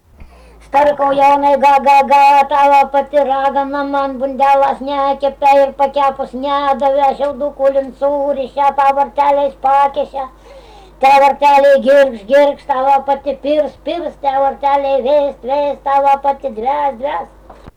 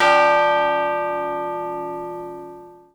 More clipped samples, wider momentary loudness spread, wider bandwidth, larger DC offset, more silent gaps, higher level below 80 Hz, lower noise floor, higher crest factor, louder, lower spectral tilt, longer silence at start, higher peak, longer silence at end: neither; second, 9 LU vs 19 LU; about the same, 12 kHz vs 11 kHz; neither; neither; first, -44 dBFS vs -58 dBFS; about the same, -39 dBFS vs -40 dBFS; second, 8 dB vs 18 dB; first, -13 LUFS vs -20 LUFS; about the same, -4.5 dB/octave vs -4 dB/octave; first, 0.2 s vs 0 s; about the same, -4 dBFS vs -2 dBFS; second, 0.05 s vs 0.2 s